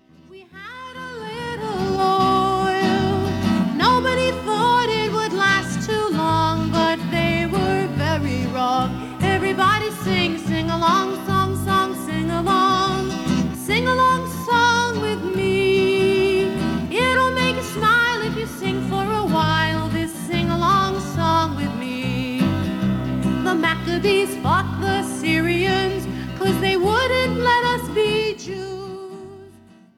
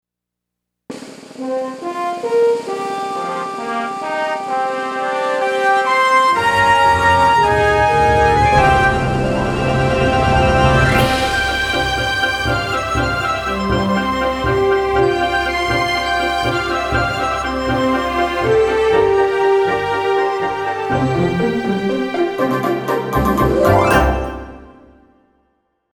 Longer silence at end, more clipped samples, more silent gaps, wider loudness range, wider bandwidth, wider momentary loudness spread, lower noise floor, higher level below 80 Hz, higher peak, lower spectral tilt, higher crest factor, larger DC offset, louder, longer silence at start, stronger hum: second, 0.5 s vs 1.25 s; neither; neither; second, 2 LU vs 7 LU; second, 17 kHz vs over 20 kHz; about the same, 8 LU vs 10 LU; second, -48 dBFS vs -82 dBFS; second, -42 dBFS vs -30 dBFS; second, -6 dBFS vs 0 dBFS; about the same, -5.5 dB/octave vs -5.5 dB/octave; about the same, 14 dB vs 16 dB; neither; second, -20 LUFS vs -16 LUFS; second, 0.3 s vs 0.9 s; neither